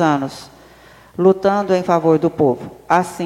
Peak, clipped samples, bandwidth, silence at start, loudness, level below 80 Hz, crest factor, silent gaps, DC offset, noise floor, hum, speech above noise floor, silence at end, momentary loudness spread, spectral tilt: 0 dBFS; under 0.1%; 14 kHz; 0 s; -17 LUFS; -54 dBFS; 16 dB; none; under 0.1%; -45 dBFS; none; 29 dB; 0 s; 13 LU; -7 dB/octave